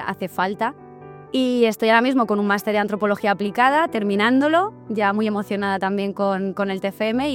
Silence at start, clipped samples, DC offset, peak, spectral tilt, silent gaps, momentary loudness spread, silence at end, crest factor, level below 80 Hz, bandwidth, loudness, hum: 0 s; under 0.1%; under 0.1%; -2 dBFS; -6 dB/octave; none; 7 LU; 0 s; 18 dB; -60 dBFS; 17 kHz; -20 LUFS; none